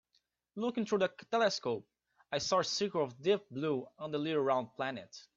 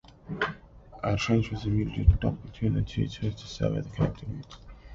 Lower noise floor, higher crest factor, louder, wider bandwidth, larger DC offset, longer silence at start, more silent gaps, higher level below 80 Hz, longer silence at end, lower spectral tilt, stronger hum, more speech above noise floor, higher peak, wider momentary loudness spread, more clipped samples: first, -78 dBFS vs -49 dBFS; about the same, 18 dB vs 22 dB; second, -34 LUFS vs -29 LUFS; about the same, 7.8 kHz vs 7.6 kHz; neither; first, 0.55 s vs 0.25 s; neither; second, -76 dBFS vs -36 dBFS; first, 0.15 s vs 0 s; second, -4 dB/octave vs -7 dB/octave; neither; first, 44 dB vs 22 dB; second, -18 dBFS vs -6 dBFS; second, 8 LU vs 16 LU; neither